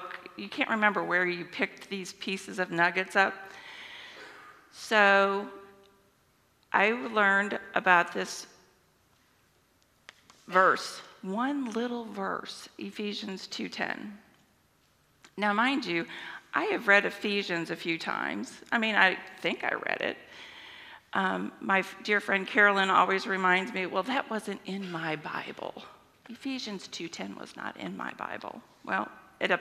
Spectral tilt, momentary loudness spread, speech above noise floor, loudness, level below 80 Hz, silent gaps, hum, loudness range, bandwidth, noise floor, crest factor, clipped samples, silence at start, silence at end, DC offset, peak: -4 dB/octave; 19 LU; 38 dB; -28 LUFS; -78 dBFS; none; none; 10 LU; 15 kHz; -67 dBFS; 26 dB; under 0.1%; 0 s; 0 s; under 0.1%; -6 dBFS